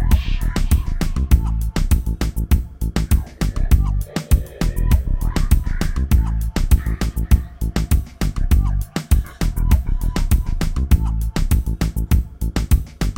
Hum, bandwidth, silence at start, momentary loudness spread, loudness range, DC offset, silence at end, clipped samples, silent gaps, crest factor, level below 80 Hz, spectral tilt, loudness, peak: none; 17 kHz; 0 s; 5 LU; 1 LU; under 0.1%; 0 s; under 0.1%; none; 16 dB; -18 dBFS; -6 dB/octave; -21 LUFS; -2 dBFS